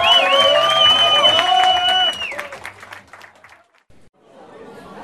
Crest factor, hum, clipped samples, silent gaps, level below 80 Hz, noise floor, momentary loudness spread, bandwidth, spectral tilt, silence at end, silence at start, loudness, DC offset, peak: 18 dB; none; under 0.1%; none; -56 dBFS; -50 dBFS; 20 LU; 14.5 kHz; -1 dB/octave; 0 s; 0 s; -12 LUFS; under 0.1%; 0 dBFS